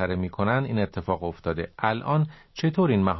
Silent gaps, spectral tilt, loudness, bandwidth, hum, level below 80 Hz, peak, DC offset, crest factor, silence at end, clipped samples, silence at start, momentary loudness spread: none; -8.5 dB/octave; -26 LUFS; 6 kHz; none; -46 dBFS; -6 dBFS; under 0.1%; 18 dB; 0 s; under 0.1%; 0 s; 7 LU